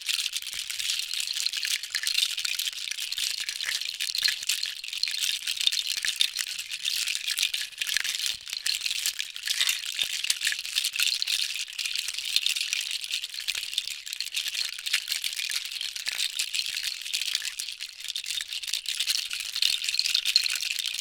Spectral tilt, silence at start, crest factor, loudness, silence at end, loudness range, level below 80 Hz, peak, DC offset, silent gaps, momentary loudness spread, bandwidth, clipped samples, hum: 5 dB/octave; 0 s; 28 dB; -27 LUFS; 0 s; 3 LU; -70 dBFS; -2 dBFS; under 0.1%; none; 6 LU; 19 kHz; under 0.1%; none